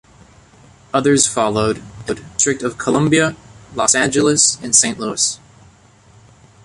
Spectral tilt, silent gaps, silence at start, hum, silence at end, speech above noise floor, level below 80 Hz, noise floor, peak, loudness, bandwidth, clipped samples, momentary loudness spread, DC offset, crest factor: -3 dB/octave; none; 0.95 s; none; 1.3 s; 32 dB; -48 dBFS; -48 dBFS; 0 dBFS; -15 LUFS; 11.5 kHz; under 0.1%; 12 LU; under 0.1%; 18 dB